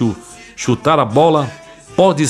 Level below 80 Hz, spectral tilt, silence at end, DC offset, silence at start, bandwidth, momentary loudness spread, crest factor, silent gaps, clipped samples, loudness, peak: -50 dBFS; -5.5 dB/octave; 0 s; under 0.1%; 0 s; 12.5 kHz; 15 LU; 14 dB; none; under 0.1%; -15 LUFS; 0 dBFS